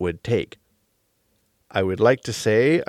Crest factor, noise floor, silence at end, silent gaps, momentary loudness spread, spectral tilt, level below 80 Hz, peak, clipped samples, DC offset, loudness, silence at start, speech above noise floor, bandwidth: 18 dB; -68 dBFS; 0.05 s; none; 8 LU; -5.5 dB/octave; -54 dBFS; -4 dBFS; under 0.1%; under 0.1%; -21 LUFS; 0 s; 48 dB; 14 kHz